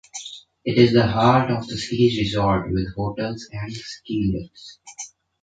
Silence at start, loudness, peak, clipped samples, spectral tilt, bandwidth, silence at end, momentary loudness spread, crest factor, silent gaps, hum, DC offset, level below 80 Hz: 0.15 s; -21 LUFS; -2 dBFS; under 0.1%; -6 dB/octave; 9.2 kHz; 0.35 s; 20 LU; 20 dB; none; none; under 0.1%; -44 dBFS